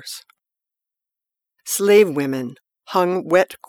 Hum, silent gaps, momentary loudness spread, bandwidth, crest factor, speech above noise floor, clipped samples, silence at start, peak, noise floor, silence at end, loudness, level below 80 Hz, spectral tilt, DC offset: none; none; 20 LU; over 20 kHz; 18 dB; 69 dB; under 0.1%; 0.05 s; -2 dBFS; -87 dBFS; 0.15 s; -18 LUFS; -72 dBFS; -4 dB/octave; under 0.1%